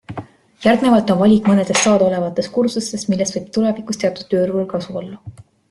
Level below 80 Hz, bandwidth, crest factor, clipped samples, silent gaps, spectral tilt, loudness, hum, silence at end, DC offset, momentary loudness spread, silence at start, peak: -54 dBFS; 12 kHz; 16 dB; under 0.1%; none; -5 dB/octave; -17 LUFS; none; 0.4 s; under 0.1%; 15 LU; 0.1 s; -2 dBFS